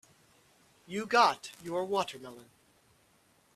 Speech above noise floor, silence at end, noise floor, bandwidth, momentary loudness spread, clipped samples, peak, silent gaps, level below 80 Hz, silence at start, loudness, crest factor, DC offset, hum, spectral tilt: 36 dB; 1.15 s; -67 dBFS; 14.5 kHz; 18 LU; under 0.1%; -10 dBFS; none; -76 dBFS; 0.9 s; -30 LUFS; 24 dB; under 0.1%; none; -3.5 dB/octave